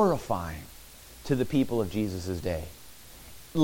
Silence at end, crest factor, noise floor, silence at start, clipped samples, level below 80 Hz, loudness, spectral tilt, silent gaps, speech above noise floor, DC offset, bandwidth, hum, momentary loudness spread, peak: 0 s; 18 dB; -49 dBFS; 0 s; under 0.1%; -48 dBFS; -30 LUFS; -6.5 dB/octave; none; 20 dB; under 0.1%; 17 kHz; none; 21 LU; -12 dBFS